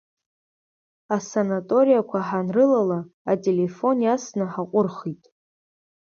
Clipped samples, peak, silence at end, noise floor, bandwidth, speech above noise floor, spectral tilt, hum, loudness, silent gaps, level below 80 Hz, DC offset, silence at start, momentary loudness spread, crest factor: under 0.1%; -8 dBFS; 0.9 s; under -90 dBFS; 7.2 kHz; over 68 dB; -7 dB/octave; none; -22 LUFS; 3.14-3.25 s; -70 dBFS; under 0.1%; 1.1 s; 9 LU; 16 dB